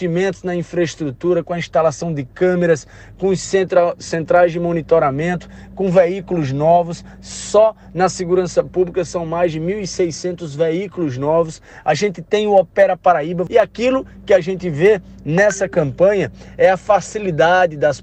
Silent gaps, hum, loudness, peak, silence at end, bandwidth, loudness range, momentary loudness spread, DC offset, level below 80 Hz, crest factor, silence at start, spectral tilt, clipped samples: none; none; -17 LUFS; 0 dBFS; 0 s; 9 kHz; 4 LU; 8 LU; under 0.1%; -46 dBFS; 16 dB; 0 s; -5.5 dB/octave; under 0.1%